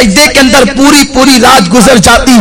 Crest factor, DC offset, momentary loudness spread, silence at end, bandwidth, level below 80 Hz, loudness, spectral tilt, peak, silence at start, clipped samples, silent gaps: 4 dB; under 0.1%; 2 LU; 0 s; 16 kHz; -22 dBFS; -3 LUFS; -3 dB/octave; 0 dBFS; 0 s; 30%; none